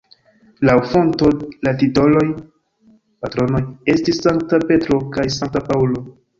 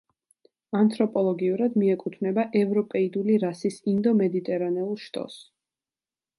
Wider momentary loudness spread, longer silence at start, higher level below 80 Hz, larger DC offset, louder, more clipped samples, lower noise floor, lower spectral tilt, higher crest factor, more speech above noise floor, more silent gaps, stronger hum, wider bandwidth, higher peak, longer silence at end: about the same, 7 LU vs 9 LU; about the same, 0.6 s vs 0.7 s; first, -42 dBFS vs -74 dBFS; neither; first, -17 LUFS vs -25 LUFS; neither; second, -54 dBFS vs under -90 dBFS; about the same, -7 dB/octave vs -8 dB/octave; about the same, 16 dB vs 16 dB; second, 37 dB vs over 66 dB; neither; neither; second, 7.6 kHz vs 11.5 kHz; first, -2 dBFS vs -10 dBFS; second, 0.3 s vs 0.95 s